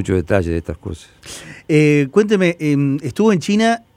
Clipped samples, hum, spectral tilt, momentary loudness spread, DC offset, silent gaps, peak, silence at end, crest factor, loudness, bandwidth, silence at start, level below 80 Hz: under 0.1%; none; -6.5 dB/octave; 19 LU; under 0.1%; none; 0 dBFS; 0.2 s; 16 dB; -16 LUFS; 15 kHz; 0 s; -44 dBFS